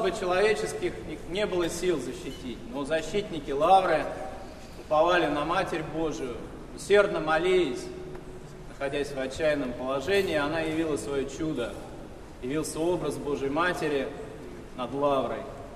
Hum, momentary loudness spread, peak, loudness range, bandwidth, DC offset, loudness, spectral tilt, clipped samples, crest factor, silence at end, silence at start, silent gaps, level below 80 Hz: none; 18 LU; -8 dBFS; 4 LU; 13.5 kHz; under 0.1%; -28 LUFS; -4.5 dB/octave; under 0.1%; 20 dB; 0 s; 0 s; none; -48 dBFS